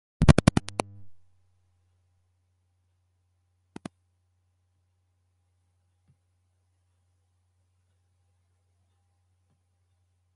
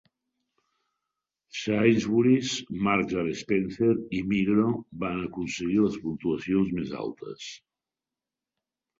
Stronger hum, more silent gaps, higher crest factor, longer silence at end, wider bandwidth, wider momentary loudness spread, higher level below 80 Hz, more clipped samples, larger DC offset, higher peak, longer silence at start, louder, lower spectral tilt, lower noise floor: neither; neither; first, 32 dB vs 20 dB; first, 9.25 s vs 1.45 s; first, 11 kHz vs 7.8 kHz; first, 26 LU vs 12 LU; first, -42 dBFS vs -58 dBFS; neither; neither; first, 0 dBFS vs -8 dBFS; second, 0.2 s vs 1.55 s; first, -23 LUFS vs -27 LUFS; about the same, -6.5 dB/octave vs -6 dB/octave; second, -72 dBFS vs -90 dBFS